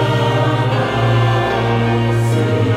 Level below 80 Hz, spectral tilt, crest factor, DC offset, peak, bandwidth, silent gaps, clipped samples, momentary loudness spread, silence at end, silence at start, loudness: -38 dBFS; -7 dB/octave; 10 dB; under 0.1%; -4 dBFS; 12 kHz; none; under 0.1%; 2 LU; 0 s; 0 s; -15 LUFS